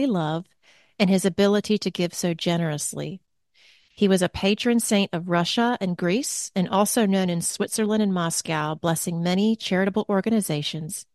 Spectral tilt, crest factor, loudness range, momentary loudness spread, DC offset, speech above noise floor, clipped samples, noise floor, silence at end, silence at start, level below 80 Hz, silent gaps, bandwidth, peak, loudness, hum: -4.5 dB/octave; 18 dB; 2 LU; 6 LU; under 0.1%; 36 dB; under 0.1%; -59 dBFS; 0.1 s; 0 s; -60 dBFS; none; 12.5 kHz; -6 dBFS; -23 LUFS; none